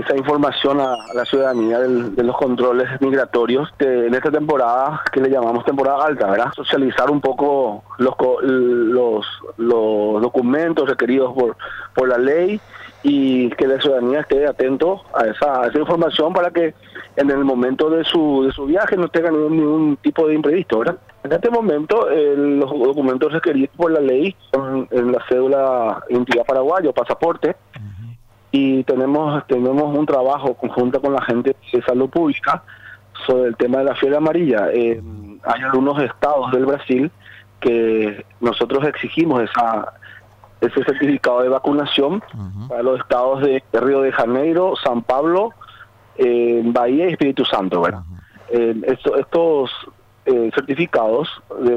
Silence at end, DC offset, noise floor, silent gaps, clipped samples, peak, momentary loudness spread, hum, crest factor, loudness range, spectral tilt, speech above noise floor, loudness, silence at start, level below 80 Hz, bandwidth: 0 s; under 0.1%; -44 dBFS; none; under 0.1%; -8 dBFS; 6 LU; none; 10 dB; 2 LU; -7 dB/octave; 27 dB; -17 LUFS; 0 s; -52 dBFS; 8.4 kHz